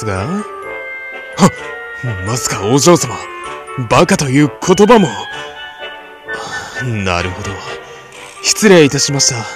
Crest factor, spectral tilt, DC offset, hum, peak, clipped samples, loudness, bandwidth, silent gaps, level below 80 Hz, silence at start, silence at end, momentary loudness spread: 14 dB; -4 dB/octave; under 0.1%; none; 0 dBFS; 0.3%; -13 LUFS; 14.5 kHz; none; -42 dBFS; 0 s; 0 s; 19 LU